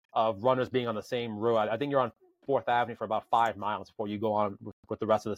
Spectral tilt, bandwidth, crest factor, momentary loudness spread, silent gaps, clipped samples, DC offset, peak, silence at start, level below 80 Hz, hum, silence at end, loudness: -6.5 dB/octave; 15.5 kHz; 18 dB; 8 LU; 4.73-4.83 s; under 0.1%; under 0.1%; -12 dBFS; 0.15 s; -72 dBFS; none; 0 s; -30 LUFS